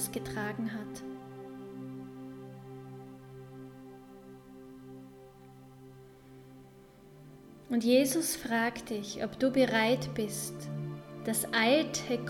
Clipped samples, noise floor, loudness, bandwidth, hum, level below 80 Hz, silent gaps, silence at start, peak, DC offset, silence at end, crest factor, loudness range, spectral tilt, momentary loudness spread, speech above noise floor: under 0.1%; -55 dBFS; -31 LUFS; 18 kHz; none; -64 dBFS; none; 0 s; -14 dBFS; under 0.1%; 0 s; 20 dB; 22 LU; -4 dB/octave; 27 LU; 25 dB